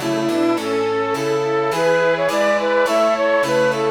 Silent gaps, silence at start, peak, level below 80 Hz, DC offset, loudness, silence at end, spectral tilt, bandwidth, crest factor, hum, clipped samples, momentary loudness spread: none; 0 s; -6 dBFS; -58 dBFS; under 0.1%; -18 LUFS; 0 s; -4.5 dB/octave; 19.5 kHz; 12 dB; none; under 0.1%; 3 LU